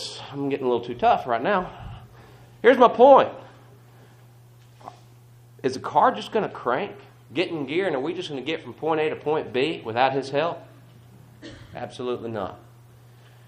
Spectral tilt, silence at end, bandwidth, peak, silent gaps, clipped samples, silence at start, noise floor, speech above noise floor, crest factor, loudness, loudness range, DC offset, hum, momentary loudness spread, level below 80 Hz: -5.5 dB/octave; 0.9 s; 10.5 kHz; 0 dBFS; none; under 0.1%; 0 s; -50 dBFS; 28 dB; 24 dB; -23 LUFS; 8 LU; under 0.1%; none; 20 LU; -58 dBFS